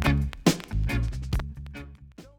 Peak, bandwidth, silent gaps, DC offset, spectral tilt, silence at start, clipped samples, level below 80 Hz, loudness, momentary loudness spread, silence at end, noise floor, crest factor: -8 dBFS; 19.5 kHz; none; under 0.1%; -5.5 dB/octave; 0 s; under 0.1%; -32 dBFS; -28 LUFS; 18 LU; 0.1 s; -48 dBFS; 20 dB